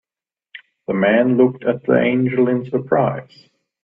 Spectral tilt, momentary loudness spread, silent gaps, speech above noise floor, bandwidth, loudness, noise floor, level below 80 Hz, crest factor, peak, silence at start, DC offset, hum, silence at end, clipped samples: -10 dB/octave; 8 LU; none; over 73 dB; 5.2 kHz; -17 LUFS; under -90 dBFS; -60 dBFS; 18 dB; 0 dBFS; 0.55 s; under 0.1%; none; 0.6 s; under 0.1%